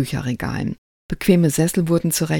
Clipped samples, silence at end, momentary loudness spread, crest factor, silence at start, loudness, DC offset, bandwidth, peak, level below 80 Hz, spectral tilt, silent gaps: under 0.1%; 0 s; 13 LU; 18 dB; 0 s; -20 LUFS; under 0.1%; 18 kHz; -2 dBFS; -42 dBFS; -5.5 dB/octave; 0.78-1.09 s